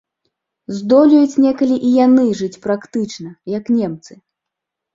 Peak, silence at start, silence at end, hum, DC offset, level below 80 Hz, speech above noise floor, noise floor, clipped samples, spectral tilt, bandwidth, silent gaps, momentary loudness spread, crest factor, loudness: -2 dBFS; 0.7 s; 0.8 s; none; under 0.1%; -60 dBFS; 67 dB; -81 dBFS; under 0.1%; -6.5 dB/octave; 7.6 kHz; none; 15 LU; 14 dB; -15 LUFS